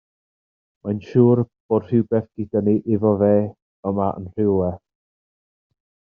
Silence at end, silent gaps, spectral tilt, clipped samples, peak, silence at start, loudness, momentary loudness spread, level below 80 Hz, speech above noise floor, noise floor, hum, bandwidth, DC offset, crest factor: 1.35 s; 1.60-1.69 s, 3.62-3.83 s; -10.5 dB/octave; under 0.1%; -4 dBFS; 0.85 s; -20 LUFS; 12 LU; -60 dBFS; over 71 dB; under -90 dBFS; none; 5.2 kHz; under 0.1%; 18 dB